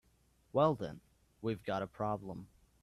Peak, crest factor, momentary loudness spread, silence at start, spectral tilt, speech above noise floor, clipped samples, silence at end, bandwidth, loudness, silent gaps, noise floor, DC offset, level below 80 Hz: -18 dBFS; 22 dB; 17 LU; 0.55 s; -8 dB/octave; 35 dB; under 0.1%; 0.4 s; 13.5 kHz; -37 LUFS; none; -71 dBFS; under 0.1%; -66 dBFS